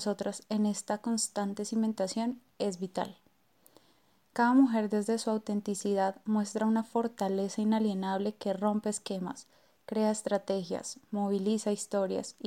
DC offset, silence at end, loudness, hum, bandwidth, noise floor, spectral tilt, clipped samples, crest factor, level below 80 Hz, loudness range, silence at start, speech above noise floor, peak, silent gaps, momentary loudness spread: under 0.1%; 0 s; -32 LUFS; none; 15 kHz; -68 dBFS; -5 dB/octave; under 0.1%; 18 dB; -80 dBFS; 4 LU; 0 s; 37 dB; -14 dBFS; none; 8 LU